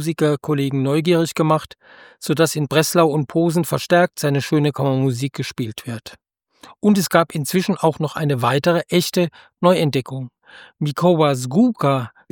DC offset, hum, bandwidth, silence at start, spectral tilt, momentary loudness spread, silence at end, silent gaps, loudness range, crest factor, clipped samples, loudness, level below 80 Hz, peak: under 0.1%; none; 18 kHz; 0 s; -5.5 dB/octave; 10 LU; 0.25 s; none; 3 LU; 18 dB; under 0.1%; -19 LUFS; -62 dBFS; -2 dBFS